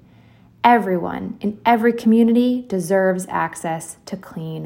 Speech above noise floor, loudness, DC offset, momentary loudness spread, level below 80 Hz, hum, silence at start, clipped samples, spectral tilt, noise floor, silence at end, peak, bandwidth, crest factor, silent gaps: 31 dB; -18 LUFS; under 0.1%; 15 LU; -58 dBFS; none; 0.65 s; under 0.1%; -6 dB/octave; -49 dBFS; 0 s; -2 dBFS; 16.5 kHz; 18 dB; none